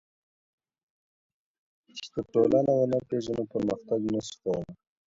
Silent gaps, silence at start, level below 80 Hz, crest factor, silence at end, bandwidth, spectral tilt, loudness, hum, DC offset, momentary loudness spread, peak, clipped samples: none; 1.95 s; -62 dBFS; 20 dB; 0.35 s; 7.8 kHz; -7 dB/octave; -28 LUFS; none; under 0.1%; 14 LU; -10 dBFS; under 0.1%